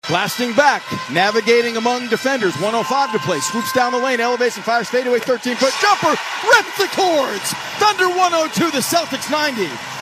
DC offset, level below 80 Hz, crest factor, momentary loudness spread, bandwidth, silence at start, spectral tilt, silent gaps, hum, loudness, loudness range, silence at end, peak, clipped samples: under 0.1%; -66 dBFS; 18 dB; 5 LU; 15 kHz; 0.05 s; -3 dB/octave; none; none; -17 LUFS; 2 LU; 0 s; 0 dBFS; under 0.1%